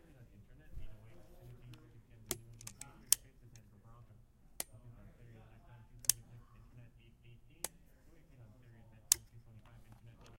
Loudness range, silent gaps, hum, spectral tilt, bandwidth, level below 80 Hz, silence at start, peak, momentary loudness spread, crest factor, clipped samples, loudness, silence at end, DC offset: 2 LU; none; none; -0.5 dB/octave; 16.5 kHz; -62 dBFS; 0 s; -6 dBFS; 28 LU; 40 dB; under 0.1%; -37 LUFS; 0 s; under 0.1%